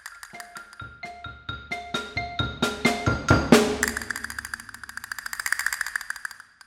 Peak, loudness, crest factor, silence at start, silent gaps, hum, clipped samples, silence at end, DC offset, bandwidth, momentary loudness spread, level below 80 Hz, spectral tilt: 0 dBFS; -25 LUFS; 26 dB; 0.05 s; none; none; under 0.1%; 0.3 s; under 0.1%; 17.5 kHz; 20 LU; -44 dBFS; -4 dB/octave